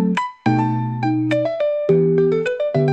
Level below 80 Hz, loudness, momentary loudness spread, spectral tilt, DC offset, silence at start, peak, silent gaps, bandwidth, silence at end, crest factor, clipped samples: -60 dBFS; -19 LUFS; 5 LU; -8.5 dB/octave; 0.1%; 0 s; -4 dBFS; none; 8.6 kHz; 0 s; 14 dB; under 0.1%